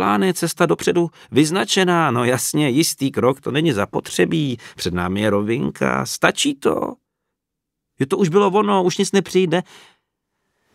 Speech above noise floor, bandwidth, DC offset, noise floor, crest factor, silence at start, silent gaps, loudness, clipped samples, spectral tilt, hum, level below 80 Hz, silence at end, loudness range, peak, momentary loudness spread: 62 dB; 16 kHz; under 0.1%; -81 dBFS; 18 dB; 0 s; none; -19 LUFS; under 0.1%; -4.5 dB/octave; none; -54 dBFS; 1.1 s; 3 LU; 0 dBFS; 7 LU